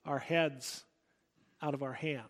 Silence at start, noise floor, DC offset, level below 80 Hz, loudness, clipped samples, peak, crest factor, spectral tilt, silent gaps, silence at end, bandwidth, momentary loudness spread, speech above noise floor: 0.05 s; -76 dBFS; under 0.1%; -82 dBFS; -36 LUFS; under 0.1%; -16 dBFS; 22 dB; -4.5 dB/octave; none; 0 s; 16.5 kHz; 11 LU; 41 dB